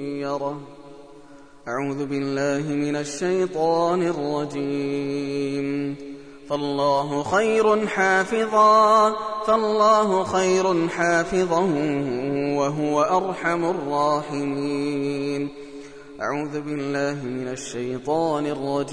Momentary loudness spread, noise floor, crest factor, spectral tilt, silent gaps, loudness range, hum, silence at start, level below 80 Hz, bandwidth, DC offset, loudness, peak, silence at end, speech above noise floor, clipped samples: 11 LU; -47 dBFS; 16 dB; -5.5 dB/octave; none; 9 LU; none; 0 s; -56 dBFS; 10.5 kHz; 0.3%; -22 LUFS; -6 dBFS; 0 s; 25 dB; under 0.1%